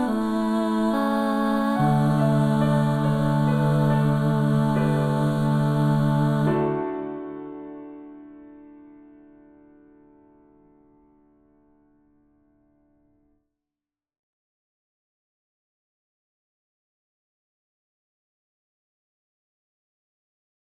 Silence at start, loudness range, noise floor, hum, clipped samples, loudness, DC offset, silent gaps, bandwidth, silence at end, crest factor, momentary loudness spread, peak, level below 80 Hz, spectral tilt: 0 s; 15 LU; under -90 dBFS; none; under 0.1%; -22 LUFS; under 0.1%; none; 13 kHz; 12.1 s; 16 dB; 16 LU; -10 dBFS; -52 dBFS; -8.5 dB/octave